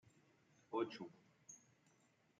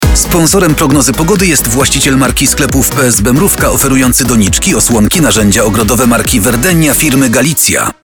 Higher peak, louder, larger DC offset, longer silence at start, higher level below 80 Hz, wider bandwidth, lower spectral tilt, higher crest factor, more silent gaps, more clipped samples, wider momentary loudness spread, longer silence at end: second, -30 dBFS vs 0 dBFS; second, -47 LUFS vs -7 LUFS; second, under 0.1% vs 0.3%; about the same, 0.05 s vs 0 s; second, under -90 dBFS vs -20 dBFS; second, 7.8 kHz vs 19.5 kHz; about the same, -4.5 dB/octave vs -3.5 dB/octave; first, 22 dB vs 8 dB; neither; neither; first, 18 LU vs 1 LU; first, 0.8 s vs 0.1 s